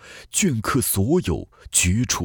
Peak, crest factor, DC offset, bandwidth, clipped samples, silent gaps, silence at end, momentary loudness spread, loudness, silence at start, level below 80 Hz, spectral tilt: -4 dBFS; 18 dB; under 0.1%; over 20 kHz; under 0.1%; none; 0 s; 7 LU; -21 LUFS; 0.05 s; -40 dBFS; -4 dB/octave